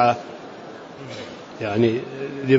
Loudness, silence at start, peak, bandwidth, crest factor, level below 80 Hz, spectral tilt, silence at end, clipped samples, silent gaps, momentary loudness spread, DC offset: -25 LUFS; 0 s; -4 dBFS; 7.8 kHz; 18 dB; -64 dBFS; -7 dB/octave; 0 s; under 0.1%; none; 17 LU; under 0.1%